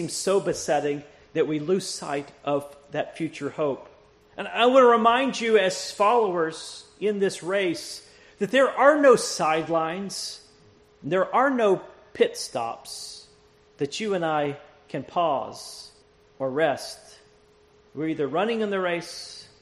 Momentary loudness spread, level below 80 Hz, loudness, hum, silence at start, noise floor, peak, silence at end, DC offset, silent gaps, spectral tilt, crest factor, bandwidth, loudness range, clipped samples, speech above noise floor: 19 LU; -66 dBFS; -24 LUFS; none; 0 s; -58 dBFS; -4 dBFS; 0.2 s; under 0.1%; none; -4 dB/octave; 22 dB; 13 kHz; 8 LU; under 0.1%; 34 dB